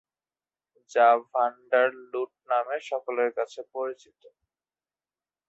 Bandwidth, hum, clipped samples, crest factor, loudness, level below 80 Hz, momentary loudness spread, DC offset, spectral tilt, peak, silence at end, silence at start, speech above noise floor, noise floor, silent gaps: 8 kHz; none; under 0.1%; 20 dB; -27 LUFS; -82 dBFS; 13 LU; under 0.1%; -3 dB/octave; -8 dBFS; 1.55 s; 0.9 s; over 64 dB; under -90 dBFS; none